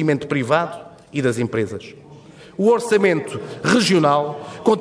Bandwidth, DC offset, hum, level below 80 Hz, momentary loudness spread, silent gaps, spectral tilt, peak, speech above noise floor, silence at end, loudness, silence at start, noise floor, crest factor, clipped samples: 11 kHz; under 0.1%; none; -60 dBFS; 14 LU; none; -5.5 dB/octave; -4 dBFS; 24 dB; 0 s; -19 LUFS; 0 s; -42 dBFS; 16 dB; under 0.1%